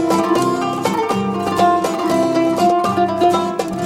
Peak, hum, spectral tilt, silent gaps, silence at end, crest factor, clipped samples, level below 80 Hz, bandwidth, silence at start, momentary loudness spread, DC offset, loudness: -2 dBFS; none; -5.5 dB/octave; none; 0 s; 14 dB; under 0.1%; -54 dBFS; 16.5 kHz; 0 s; 4 LU; under 0.1%; -16 LUFS